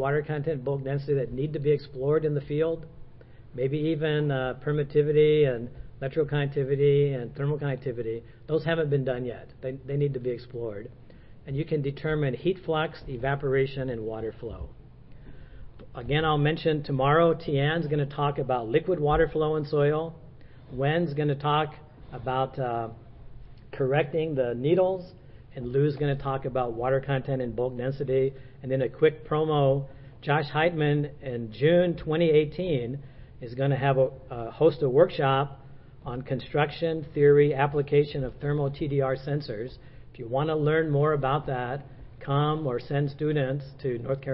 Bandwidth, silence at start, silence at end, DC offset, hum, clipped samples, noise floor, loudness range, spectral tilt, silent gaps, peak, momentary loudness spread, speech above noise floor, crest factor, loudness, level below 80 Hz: 5.6 kHz; 0 s; 0 s; under 0.1%; none; under 0.1%; -47 dBFS; 5 LU; -11.5 dB/octave; none; -8 dBFS; 14 LU; 21 dB; 20 dB; -27 LUFS; -50 dBFS